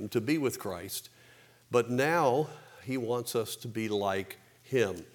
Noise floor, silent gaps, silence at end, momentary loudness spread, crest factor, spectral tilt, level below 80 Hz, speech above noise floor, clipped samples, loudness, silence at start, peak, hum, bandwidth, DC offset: -59 dBFS; none; 0.1 s; 12 LU; 20 dB; -5 dB/octave; -76 dBFS; 28 dB; under 0.1%; -31 LUFS; 0 s; -12 dBFS; none; over 20 kHz; under 0.1%